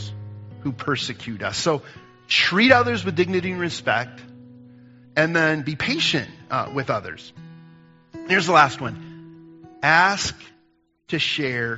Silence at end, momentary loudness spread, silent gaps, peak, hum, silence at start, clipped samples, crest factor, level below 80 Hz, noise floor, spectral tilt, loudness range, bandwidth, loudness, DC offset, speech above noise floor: 0 s; 19 LU; none; 0 dBFS; none; 0 s; under 0.1%; 24 dB; -58 dBFS; -63 dBFS; -2.5 dB/octave; 3 LU; 8 kHz; -21 LUFS; under 0.1%; 42 dB